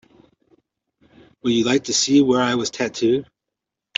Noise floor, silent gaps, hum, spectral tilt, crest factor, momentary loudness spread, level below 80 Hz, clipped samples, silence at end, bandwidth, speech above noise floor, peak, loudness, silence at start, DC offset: -83 dBFS; none; none; -3.5 dB/octave; 20 dB; 9 LU; -62 dBFS; under 0.1%; 0.75 s; 8 kHz; 65 dB; -2 dBFS; -19 LUFS; 1.45 s; under 0.1%